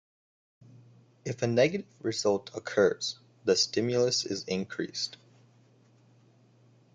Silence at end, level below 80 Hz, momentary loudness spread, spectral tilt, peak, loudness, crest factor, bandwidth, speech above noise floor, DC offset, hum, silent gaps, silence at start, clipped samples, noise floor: 1.8 s; -72 dBFS; 9 LU; -4 dB/octave; -12 dBFS; -29 LUFS; 20 dB; 9.4 kHz; 33 dB; under 0.1%; none; none; 1.25 s; under 0.1%; -62 dBFS